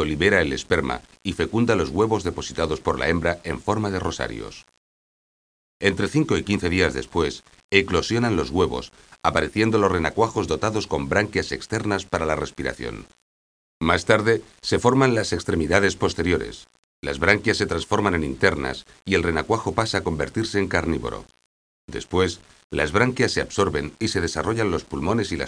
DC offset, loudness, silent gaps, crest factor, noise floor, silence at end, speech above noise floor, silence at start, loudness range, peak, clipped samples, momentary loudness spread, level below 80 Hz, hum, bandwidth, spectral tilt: under 0.1%; -23 LUFS; 4.77-5.80 s, 7.64-7.69 s, 13.22-13.81 s, 16.79-17.02 s, 21.46-21.88 s, 22.64-22.70 s; 22 dB; under -90 dBFS; 0 s; over 67 dB; 0 s; 4 LU; 0 dBFS; under 0.1%; 10 LU; -42 dBFS; none; 10.5 kHz; -5 dB/octave